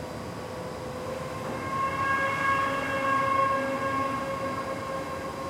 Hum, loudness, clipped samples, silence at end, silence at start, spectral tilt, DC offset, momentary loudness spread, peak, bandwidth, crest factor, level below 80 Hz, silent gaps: none; -29 LUFS; under 0.1%; 0 s; 0 s; -5 dB/octave; under 0.1%; 11 LU; -12 dBFS; 16.5 kHz; 16 dB; -56 dBFS; none